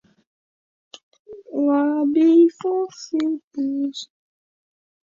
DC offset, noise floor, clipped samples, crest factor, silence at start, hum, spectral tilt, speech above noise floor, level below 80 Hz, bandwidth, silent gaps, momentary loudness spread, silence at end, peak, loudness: under 0.1%; under -90 dBFS; under 0.1%; 16 dB; 1.3 s; none; -4.5 dB/octave; over 71 dB; -74 dBFS; 7.4 kHz; 3.44-3.51 s; 14 LU; 1 s; -6 dBFS; -20 LUFS